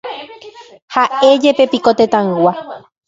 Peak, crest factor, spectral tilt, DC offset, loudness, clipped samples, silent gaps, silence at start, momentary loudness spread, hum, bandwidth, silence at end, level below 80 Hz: 0 dBFS; 14 dB; -5.5 dB/octave; under 0.1%; -12 LUFS; under 0.1%; 0.82-0.88 s; 0.05 s; 19 LU; none; 7.8 kHz; 0.3 s; -58 dBFS